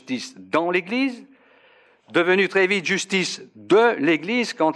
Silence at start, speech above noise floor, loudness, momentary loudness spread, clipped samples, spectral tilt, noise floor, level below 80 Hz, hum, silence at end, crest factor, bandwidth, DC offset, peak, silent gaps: 0.1 s; 34 dB; -21 LUFS; 11 LU; under 0.1%; -4 dB/octave; -55 dBFS; -78 dBFS; none; 0 s; 16 dB; 11.5 kHz; under 0.1%; -6 dBFS; none